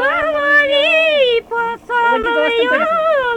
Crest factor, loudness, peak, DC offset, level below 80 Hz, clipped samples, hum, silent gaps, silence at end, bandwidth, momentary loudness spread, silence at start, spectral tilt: 12 dB; -14 LUFS; -2 dBFS; under 0.1%; -48 dBFS; under 0.1%; none; none; 0 s; 11.5 kHz; 6 LU; 0 s; -3 dB/octave